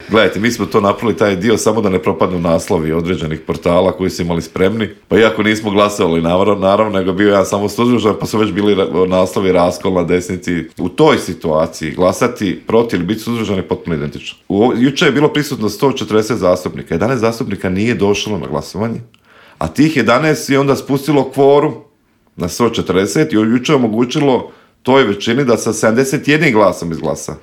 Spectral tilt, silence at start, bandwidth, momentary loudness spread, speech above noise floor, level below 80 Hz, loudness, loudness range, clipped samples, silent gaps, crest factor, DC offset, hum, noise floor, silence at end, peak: -5.5 dB/octave; 0 s; 16.5 kHz; 8 LU; 41 dB; -46 dBFS; -14 LUFS; 3 LU; under 0.1%; none; 14 dB; under 0.1%; none; -54 dBFS; 0.05 s; 0 dBFS